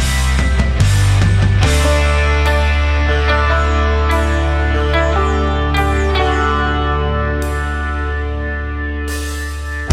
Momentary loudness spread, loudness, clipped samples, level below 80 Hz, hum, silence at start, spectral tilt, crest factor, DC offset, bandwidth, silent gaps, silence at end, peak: 8 LU; -15 LUFS; under 0.1%; -16 dBFS; none; 0 s; -5.5 dB/octave; 12 dB; under 0.1%; 13.5 kHz; none; 0 s; -2 dBFS